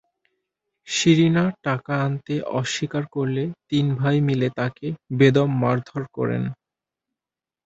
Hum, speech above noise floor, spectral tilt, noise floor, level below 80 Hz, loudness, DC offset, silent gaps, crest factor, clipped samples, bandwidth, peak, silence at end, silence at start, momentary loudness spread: none; 68 dB; -6 dB/octave; -90 dBFS; -60 dBFS; -22 LUFS; under 0.1%; none; 20 dB; under 0.1%; 8 kHz; -2 dBFS; 1.1 s; 0.85 s; 10 LU